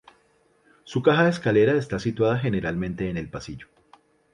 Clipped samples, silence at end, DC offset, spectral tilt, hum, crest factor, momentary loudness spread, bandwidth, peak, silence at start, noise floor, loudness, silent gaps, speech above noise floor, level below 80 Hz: under 0.1%; 0.7 s; under 0.1%; -7 dB/octave; none; 20 dB; 16 LU; 11 kHz; -6 dBFS; 0.85 s; -63 dBFS; -23 LUFS; none; 40 dB; -50 dBFS